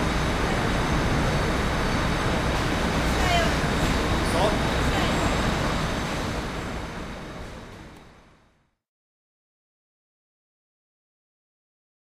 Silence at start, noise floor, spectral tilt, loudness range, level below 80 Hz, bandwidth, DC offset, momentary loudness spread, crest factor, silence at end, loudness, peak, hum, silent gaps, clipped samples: 0 s; -64 dBFS; -5 dB/octave; 15 LU; -32 dBFS; 15.5 kHz; under 0.1%; 13 LU; 18 dB; 4.05 s; -25 LUFS; -10 dBFS; none; none; under 0.1%